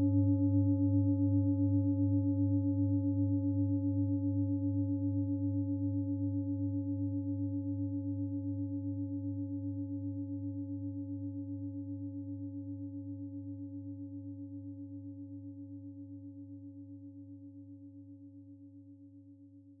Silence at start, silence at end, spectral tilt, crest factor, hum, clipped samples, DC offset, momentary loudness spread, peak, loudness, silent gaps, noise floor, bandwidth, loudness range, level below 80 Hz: 0 s; 0.05 s; -15.5 dB/octave; 16 dB; none; under 0.1%; under 0.1%; 20 LU; -20 dBFS; -35 LUFS; none; -57 dBFS; 0.9 kHz; 18 LU; -70 dBFS